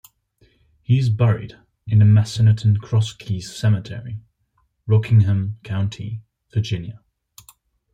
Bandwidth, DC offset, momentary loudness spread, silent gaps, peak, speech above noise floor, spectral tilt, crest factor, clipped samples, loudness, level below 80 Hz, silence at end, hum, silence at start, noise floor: 9 kHz; under 0.1%; 20 LU; none; -4 dBFS; 49 dB; -7.5 dB/octave; 16 dB; under 0.1%; -19 LUFS; -52 dBFS; 1 s; none; 0.9 s; -67 dBFS